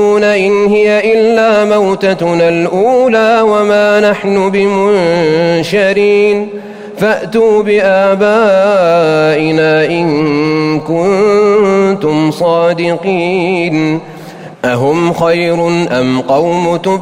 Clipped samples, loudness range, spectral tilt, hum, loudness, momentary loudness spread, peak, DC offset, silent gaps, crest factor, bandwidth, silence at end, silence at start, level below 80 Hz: under 0.1%; 3 LU; -6 dB/octave; none; -10 LUFS; 5 LU; 0 dBFS; under 0.1%; none; 8 dB; 15 kHz; 0 s; 0 s; -48 dBFS